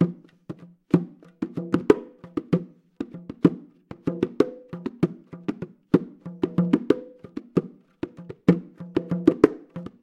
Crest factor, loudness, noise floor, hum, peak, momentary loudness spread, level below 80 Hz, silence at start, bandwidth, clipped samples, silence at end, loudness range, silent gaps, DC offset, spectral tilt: 26 dB; -25 LUFS; -45 dBFS; none; 0 dBFS; 18 LU; -58 dBFS; 0 s; 8.8 kHz; under 0.1%; 0.15 s; 3 LU; none; under 0.1%; -9 dB/octave